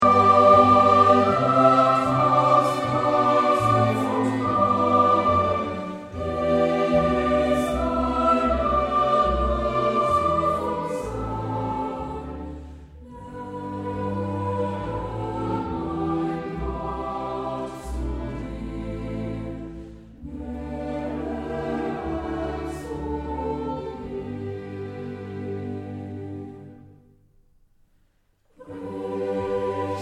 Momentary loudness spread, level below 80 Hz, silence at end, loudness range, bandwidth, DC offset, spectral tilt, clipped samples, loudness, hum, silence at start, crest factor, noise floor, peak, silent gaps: 17 LU; -40 dBFS; 0 s; 14 LU; 13.5 kHz; under 0.1%; -7 dB/octave; under 0.1%; -23 LUFS; none; 0 s; 20 dB; -64 dBFS; -4 dBFS; none